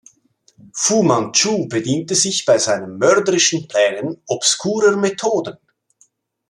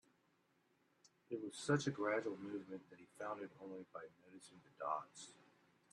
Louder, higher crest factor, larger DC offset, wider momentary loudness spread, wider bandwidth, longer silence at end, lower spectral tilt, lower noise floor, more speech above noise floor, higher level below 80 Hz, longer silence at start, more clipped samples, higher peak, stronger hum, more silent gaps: first, -16 LUFS vs -45 LUFS; second, 18 dB vs 24 dB; neither; second, 6 LU vs 22 LU; about the same, 13 kHz vs 12 kHz; first, 1 s vs 0.6 s; second, -3 dB/octave vs -5.5 dB/octave; second, -58 dBFS vs -79 dBFS; first, 42 dB vs 34 dB; first, -64 dBFS vs -86 dBFS; second, 0.75 s vs 1.3 s; neither; first, -2 dBFS vs -22 dBFS; neither; neither